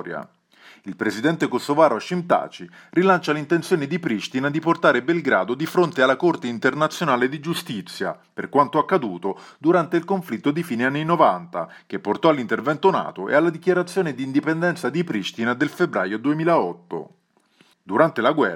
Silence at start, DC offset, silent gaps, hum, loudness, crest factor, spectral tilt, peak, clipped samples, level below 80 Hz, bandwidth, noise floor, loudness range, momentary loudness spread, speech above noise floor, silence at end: 0 s; under 0.1%; none; none; -21 LUFS; 20 dB; -6 dB/octave; -2 dBFS; under 0.1%; -74 dBFS; 17 kHz; -59 dBFS; 2 LU; 11 LU; 38 dB; 0 s